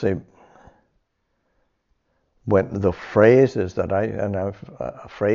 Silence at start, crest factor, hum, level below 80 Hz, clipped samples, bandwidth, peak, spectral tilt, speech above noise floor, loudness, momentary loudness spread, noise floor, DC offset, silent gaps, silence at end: 0 s; 20 dB; none; -52 dBFS; under 0.1%; 7.2 kHz; -2 dBFS; -7.5 dB/octave; 51 dB; -20 LUFS; 18 LU; -71 dBFS; under 0.1%; none; 0 s